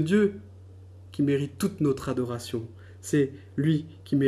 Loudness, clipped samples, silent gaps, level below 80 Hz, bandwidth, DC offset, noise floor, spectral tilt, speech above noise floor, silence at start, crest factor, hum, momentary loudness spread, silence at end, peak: -28 LUFS; under 0.1%; none; -60 dBFS; 13.5 kHz; under 0.1%; -47 dBFS; -7 dB/octave; 21 dB; 0 s; 16 dB; none; 16 LU; 0 s; -10 dBFS